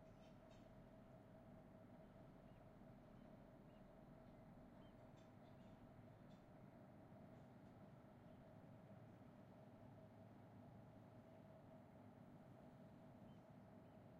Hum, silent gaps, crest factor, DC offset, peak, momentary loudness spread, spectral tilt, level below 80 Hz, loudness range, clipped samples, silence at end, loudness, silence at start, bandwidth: none; none; 12 dB; under 0.1%; -52 dBFS; 1 LU; -7.5 dB/octave; -78 dBFS; 1 LU; under 0.1%; 0 s; -65 LUFS; 0 s; 6.6 kHz